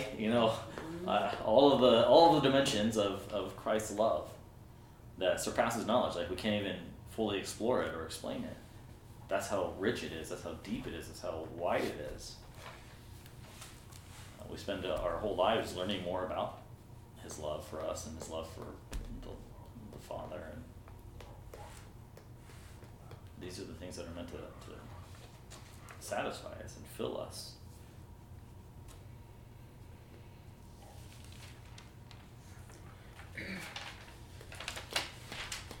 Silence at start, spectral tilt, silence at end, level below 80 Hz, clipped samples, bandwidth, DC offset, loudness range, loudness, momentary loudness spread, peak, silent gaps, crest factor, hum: 0 s; -4.5 dB/octave; 0 s; -56 dBFS; under 0.1%; 18.5 kHz; under 0.1%; 23 LU; -34 LUFS; 22 LU; -12 dBFS; none; 26 dB; none